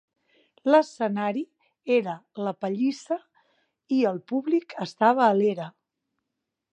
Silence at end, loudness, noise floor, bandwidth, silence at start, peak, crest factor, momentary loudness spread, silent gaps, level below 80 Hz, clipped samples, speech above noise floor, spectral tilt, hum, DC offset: 1.05 s; -25 LUFS; -83 dBFS; 9.2 kHz; 0.65 s; -6 dBFS; 20 dB; 14 LU; none; -82 dBFS; under 0.1%; 59 dB; -6.5 dB/octave; none; under 0.1%